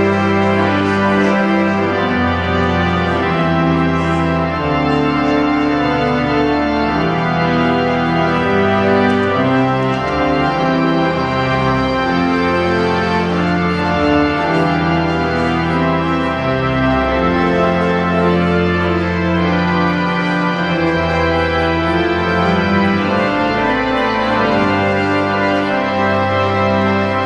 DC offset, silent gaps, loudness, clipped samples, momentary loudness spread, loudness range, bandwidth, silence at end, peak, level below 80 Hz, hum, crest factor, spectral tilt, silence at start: under 0.1%; none; -15 LUFS; under 0.1%; 2 LU; 1 LU; 9.2 kHz; 0 s; -2 dBFS; -34 dBFS; none; 12 dB; -7 dB/octave; 0 s